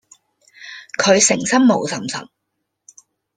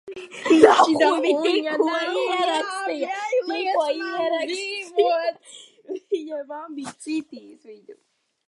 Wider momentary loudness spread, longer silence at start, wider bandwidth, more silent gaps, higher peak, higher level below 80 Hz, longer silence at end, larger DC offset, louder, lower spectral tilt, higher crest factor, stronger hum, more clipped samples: about the same, 19 LU vs 18 LU; first, 0.6 s vs 0.05 s; second, 10 kHz vs 11.5 kHz; neither; about the same, -2 dBFS vs 0 dBFS; first, -62 dBFS vs -70 dBFS; first, 1.15 s vs 0.55 s; neither; first, -16 LUFS vs -21 LUFS; about the same, -3 dB/octave vs -3 dB/octave; about the same, 18 dB vs 22 dB; neither; neither